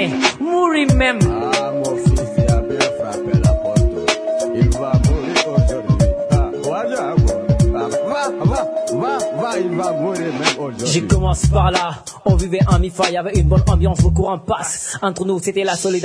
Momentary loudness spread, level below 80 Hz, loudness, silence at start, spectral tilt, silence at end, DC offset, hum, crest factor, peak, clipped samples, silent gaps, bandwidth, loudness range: 6 LU; -24 dBFS; -17 LUFS; 0 s; -5.5 dB/octave; 0 s; under 0.1%; none; 16 dB; 0 dBFS; under 0.1%; none; 11 kHz; 2 LU